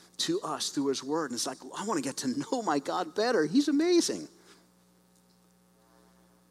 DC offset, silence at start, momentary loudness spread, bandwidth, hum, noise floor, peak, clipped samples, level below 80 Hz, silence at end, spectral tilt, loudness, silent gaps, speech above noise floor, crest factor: under 0.1%; 0.2 s; 8 LU; 15 kHz; 60 Hz at -65 dBFS; -64 dBFS; -14 dBFS; under 0.1%; -78 dBFS; 2.25 s; -3.5 dB/octave; -30 LUFS; none; 34 dB; 16 dB